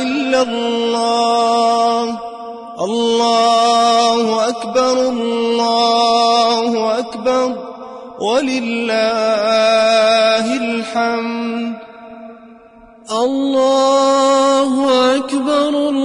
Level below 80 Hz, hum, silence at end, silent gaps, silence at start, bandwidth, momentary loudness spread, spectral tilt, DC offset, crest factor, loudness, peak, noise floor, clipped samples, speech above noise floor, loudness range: -60 dBFS; none; 0 s; none; 0 s; 11 kHz; 11 LU; -3 dB/octave; under 0.1%; 12 dB; -14 LUFS; -2 dBFS; -42 dBFS; under 0.1%; 28 dB; 4 LU